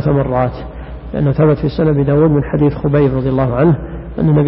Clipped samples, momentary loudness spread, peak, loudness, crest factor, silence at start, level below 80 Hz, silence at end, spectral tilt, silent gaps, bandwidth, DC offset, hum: under 0.1%; 12 LU; 0 dBFS; -14 LUFS; 12 dB; 0 s; -30 dBFS; 0 s; -14 dB/octave; none; 5.6 kHz; under 0.1%; none